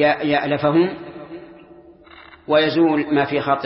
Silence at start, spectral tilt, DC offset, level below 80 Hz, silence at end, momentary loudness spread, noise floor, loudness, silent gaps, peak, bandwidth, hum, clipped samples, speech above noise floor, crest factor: 0 s; -10.5 dB/octave; under 0.1%; -58 dBFS; 0 s; 20 LU; -45 dBFS; -18 LUFS; none; -4 dBFS; 5.8 kHz; none; under 0.1%; 27 dB; 16 dB